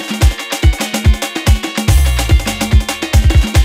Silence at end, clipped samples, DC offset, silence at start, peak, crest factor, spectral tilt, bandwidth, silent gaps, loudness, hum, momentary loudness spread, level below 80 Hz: 0 s; under 0.1%; under 0.1%; 0 s; 0 dBFS; 12 dB; -4.5 dB/octave; 16 kHz; none; -14 LUFS; none; 3 LU; -14 dBFS